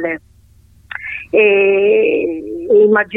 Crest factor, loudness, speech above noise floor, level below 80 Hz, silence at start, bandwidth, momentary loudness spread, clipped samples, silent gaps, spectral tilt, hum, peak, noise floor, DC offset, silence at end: 14 dB; -13 LUFS; 35 dB; -50 dBFS; 0 s; 3.8 kHz; 16 LU; under 0.1%; none; -7.5 dB/octave; none; -2 dBFS; -47 dBFS; under 0.1%; 0 s